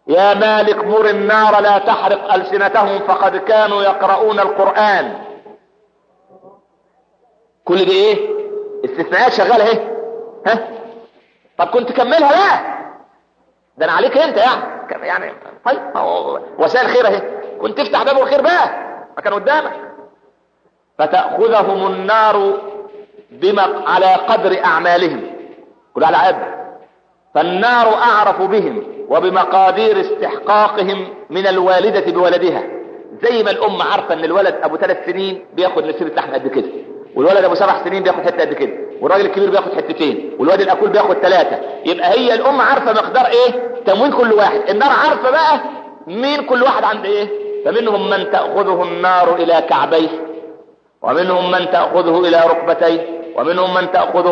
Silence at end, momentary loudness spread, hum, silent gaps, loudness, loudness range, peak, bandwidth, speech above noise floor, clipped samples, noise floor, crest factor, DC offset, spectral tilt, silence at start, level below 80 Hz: 0 s; 12 LU; none; none; -14 LUFS; 4 LU; -2 dBFS; 7.4 kHz; 46 dB; under 0.1%; -59 dBFS; 12 dB; under 0.1%; -5.5 dB/octave; 0.05 s; -68 dBFS